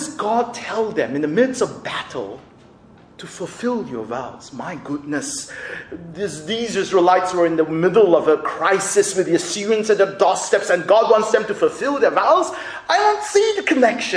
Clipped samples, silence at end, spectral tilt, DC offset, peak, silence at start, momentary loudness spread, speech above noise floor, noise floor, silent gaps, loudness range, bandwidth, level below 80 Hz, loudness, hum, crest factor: under 0.1%; 0 s; -3.5 dB/octave; under 0.1%; -2 dBFS; 0 s; 15 LU; 29 dB; -47 dBFS; none; 11 LU; 10.5 kHz; -60 dBFS; -18 LUFS; none; 18 dB